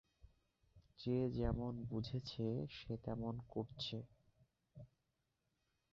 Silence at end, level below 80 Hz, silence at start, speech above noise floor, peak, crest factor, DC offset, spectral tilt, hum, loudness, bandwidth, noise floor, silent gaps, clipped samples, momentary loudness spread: 1.05 s; -60 dBFS; 0.25 s; 44 dB; -28 dBFS; 18 dB; under 0.1%; -7 dB/octave; none; -44 LUFS; 7.4 kHz; -87 dBFS; none; under 0.1%; 21 LU